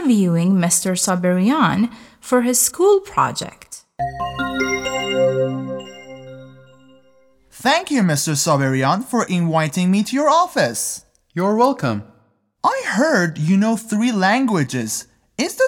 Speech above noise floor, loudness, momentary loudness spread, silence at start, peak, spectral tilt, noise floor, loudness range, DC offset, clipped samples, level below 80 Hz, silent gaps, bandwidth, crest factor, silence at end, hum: 41 dB; -18 LUFS; 13 LU; 0 s; -2 dBFS; -4.5 dB/octave; -59 dBFS; 6 LU; under 0.1%; under 0.1%; -54 dBFS; none; 18 kHz; 16 dB; 0 s; none